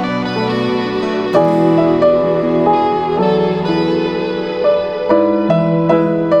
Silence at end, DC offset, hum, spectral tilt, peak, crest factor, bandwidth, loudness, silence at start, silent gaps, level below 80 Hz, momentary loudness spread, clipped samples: 0 s; under 0.1%; none; -8 dB/octave; 0 dBFS; 14 dB; 8.2 kHz; -14 LUFS; 0 s; none; -48 dBFS; 5 LU; under 0.1%